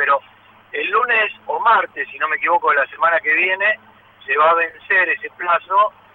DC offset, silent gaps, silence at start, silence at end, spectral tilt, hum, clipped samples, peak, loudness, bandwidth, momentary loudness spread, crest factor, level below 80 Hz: under 0.1%; none; 0 s; 0.25 s; -5 dB/octave; none; under 0.1%; -4 dBFS; -17 LUFS; 16 kHz; 8 LU; 14 dB; -70 dBFS